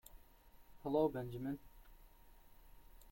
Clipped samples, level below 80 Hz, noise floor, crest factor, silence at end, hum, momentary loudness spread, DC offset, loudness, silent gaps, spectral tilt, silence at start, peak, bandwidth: under 0.1%; -62 dBFS; -63 dBFS; 22 dB; 0 s; none; 14 LU; under 0.1%; -41 LUFS; none; -8 dB/octave; 0.15 s; -24 dBFS; 16.5 kHz